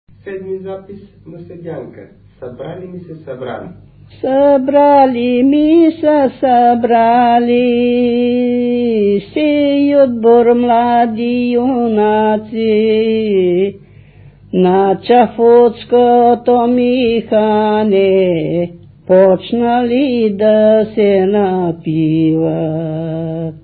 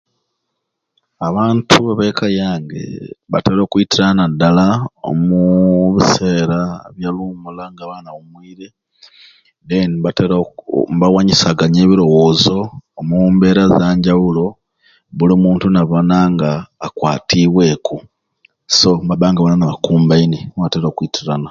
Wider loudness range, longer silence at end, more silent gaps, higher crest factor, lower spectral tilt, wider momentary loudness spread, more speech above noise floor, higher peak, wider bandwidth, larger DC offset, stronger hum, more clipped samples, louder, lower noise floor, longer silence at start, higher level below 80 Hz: second, 4 LU vs 8 LU; about the same, 0.05 s vs 0 s; neither; about the same, 12 dB vs 14 dB; first, -12 dB/octave vs -6 dB/octave; first, 17 LU vs 14 LU; second, 28 dB vs 61 dB; about the same, 0 dBFS vs 0 dBFS; second, 4.6 kHz vs 7.6 kHz; neither; neither; neither; about the same, -12 LUFS vs -13 LUFS; second, -40 dBFS vs -74 dBFS; second, 0.25 s vs 1.2 s; second, -48 dBFS vs -42 dBFS